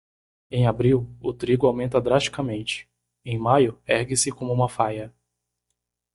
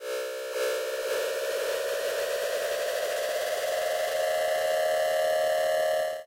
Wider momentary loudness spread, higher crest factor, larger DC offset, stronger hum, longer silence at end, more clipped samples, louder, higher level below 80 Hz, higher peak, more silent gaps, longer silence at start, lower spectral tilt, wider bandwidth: first, 11 LU vs 4 LU; first, 20 dB vs 8 dB; neither; first, 60 Hz at -40 dBFS vs none; first, 1.05 s vs 0 s; neither; first, -23 LUFS vs -28 LUFS; first, -52 dBFS vs -70 dBFS; first, -4 dBFS vs -20 dBFS; neither; first, 0.5 s vs 0 s; first, -5 dB/octave vs 0 dB/octave; second, 11.5 kHz vs 16 kHz